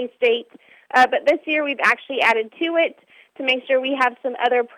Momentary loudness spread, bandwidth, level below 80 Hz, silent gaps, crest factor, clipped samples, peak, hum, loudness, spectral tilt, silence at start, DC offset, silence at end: 6 LU; 14 kHz; -74 dBFS; none; 18 dB; under 0.1%; -4 dBFS; none; -19 LUFS; -2.5 dB/octave; 0 s; under 0.1%; 0.1 s